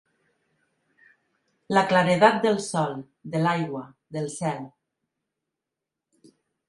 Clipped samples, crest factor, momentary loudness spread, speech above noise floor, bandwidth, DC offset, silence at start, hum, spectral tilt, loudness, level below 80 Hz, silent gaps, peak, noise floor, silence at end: under 0.1%; 24 dB; 18 LU; 63 dB; 11.5 kHz; under 0.1%; 1.7 s; none; -5.5 dB/octave; -24 LUFS; -68 dBFS; none; -2 dBFS; -86 dBFS; 2 s